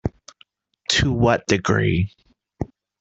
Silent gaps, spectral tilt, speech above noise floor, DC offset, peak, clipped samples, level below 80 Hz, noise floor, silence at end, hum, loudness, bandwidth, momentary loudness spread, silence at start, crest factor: none; -5 dB/octave; 38 dB; under 0.1%; -2 dBFS; under 0.1%; -42 dBFS; -58 dBFS; 0.35 s; none; -20 LUFS; 8.2 kHz; 15 LU; 0.05 s; 20 dB